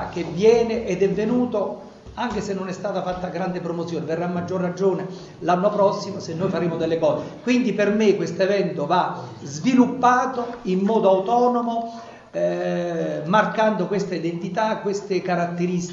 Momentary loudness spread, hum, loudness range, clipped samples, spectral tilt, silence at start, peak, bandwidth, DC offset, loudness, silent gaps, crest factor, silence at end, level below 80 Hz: 10 LU; none; 5 LU; under 0.1%; -6.5 dB/octave; 0 s; -4 dBFS; 7.8 kHz; under 0.1%; -22 LUFS; none; 18 dB; 0 s; -54 dBFS